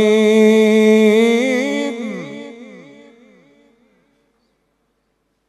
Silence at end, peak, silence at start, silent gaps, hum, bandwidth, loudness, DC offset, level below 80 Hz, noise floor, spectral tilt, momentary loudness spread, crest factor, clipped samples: 2.75 s; -2 dBFS; 0 s; none; none; 12.5 kHz; -13 LUFS; under 0.1%; -72 dBFS; -67 dBFS; -5.5 dB/octave; 19 LU; 14 dB; under 0.1%